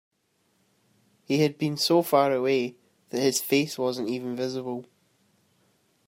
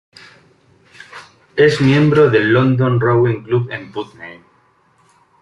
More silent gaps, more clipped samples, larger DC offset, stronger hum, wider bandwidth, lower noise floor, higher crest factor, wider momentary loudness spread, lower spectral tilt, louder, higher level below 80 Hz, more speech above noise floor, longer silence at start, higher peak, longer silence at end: neither; neither; neither; neither; first, 16 kHz vs 10.5 kHz; first, -71 dBFS vs -55 dBFS; about the same, 20 dB vs 16 dB; second, 12 LU vs 24 LU; second, -4.5 dB/octave vs -7.5 dB/octave; second, -26 LUFS vs -14 LUFS; second, -76 dBFS vs -52 dBFS; first, 46 dB vs 42 dB; first, 1.3 s vs 1.15 s; second, -8 dBFS vs 0 dBFS; first, 1.25 s vs 1.1 s